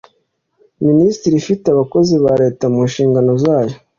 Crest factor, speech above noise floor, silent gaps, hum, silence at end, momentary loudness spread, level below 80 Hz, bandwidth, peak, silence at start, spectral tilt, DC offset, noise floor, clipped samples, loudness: 12 dB; 51 dB; none; none; 0.2 s; 4 LU; -50 dBFS; 7.4 kHz; -2 dBFS; 0.8 s; -7.5 dB/octave; under 0.1%; -64 dBFS; under 0.1%; -14 LUFS